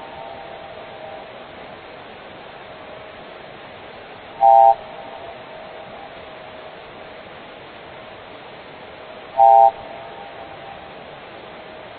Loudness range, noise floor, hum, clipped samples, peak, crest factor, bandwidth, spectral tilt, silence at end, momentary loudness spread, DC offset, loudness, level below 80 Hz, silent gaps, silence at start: 17 LU; -38 dBFS; none; under 0.1%; -2 dBFS; 20 dB; 4.5 kHz; -7.5 dB/octave; 1.55 s; 25 LU; under 0.1%; -14 LUFS; -60 dBFS; none; 0.15 s